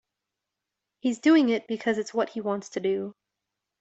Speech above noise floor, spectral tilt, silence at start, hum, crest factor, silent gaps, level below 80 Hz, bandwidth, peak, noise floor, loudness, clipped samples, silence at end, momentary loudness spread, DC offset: 61 dB; -5 dB/octave; 1.05 s; none; 18 dB; none; -74 dBFS; 8 kHz; -10 dBFS; -86 dBFS; -26 LUFS; under 0.1%; 0.7 s; 11 LU; under 0.1%